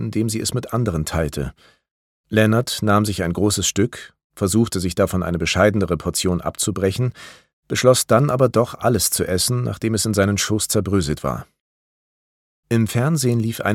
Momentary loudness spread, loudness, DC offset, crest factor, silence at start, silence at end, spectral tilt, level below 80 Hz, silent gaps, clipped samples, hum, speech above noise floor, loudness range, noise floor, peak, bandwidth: 7 LU; -19 LUFS; under 0.1%; 18 dB; 0 s; 0 s; -5 dB/octave; -42 dBFS; 1.91-2.24 s, 4.24-4.30 s, 7.53-7.63 s, 11.61-12.63 s; under 0.1%; none; over 71 dB; 4 LU; under -90 dBFS; 0 dBFS; 17 kHz